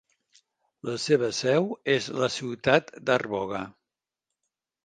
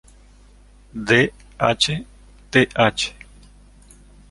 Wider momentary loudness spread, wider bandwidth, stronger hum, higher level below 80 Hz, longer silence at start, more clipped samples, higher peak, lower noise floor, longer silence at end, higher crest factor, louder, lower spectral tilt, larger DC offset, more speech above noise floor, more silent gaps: about the same, 11 LU vs 12 LU; second, 9.6 kHz vs 11.5 kHz; second, none vs 50 Hz at -45 dBFS; second, -66 dBFS vs -46 dBFS; about the same, 0.85 s vs 0.95 s; neither; about the same, -4 dBFS vs -2 dBFS; first, -88 dBFS vs -49 dBFS; about the same, 1.15 s vs 1.2 s; about the same, 24 dB vs 22 dB; second, -26 LUFS vs -19 LUFS; about the same, -4.5 dB/octave vs -4 dB/octave; neither; first, 62 dB vs 30 dB; neither